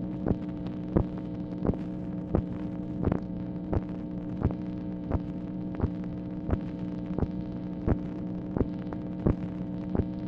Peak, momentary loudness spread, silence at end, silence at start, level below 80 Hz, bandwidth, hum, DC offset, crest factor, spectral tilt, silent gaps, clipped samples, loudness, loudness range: -10 dBFS; 6 LU; 0 s; 0 s; -42 dBFS; 5.6 kHz; none; under 0.1%; 22 dB; -11 dB/octave; none; under 0.1%; -33 LUFS; 2 LU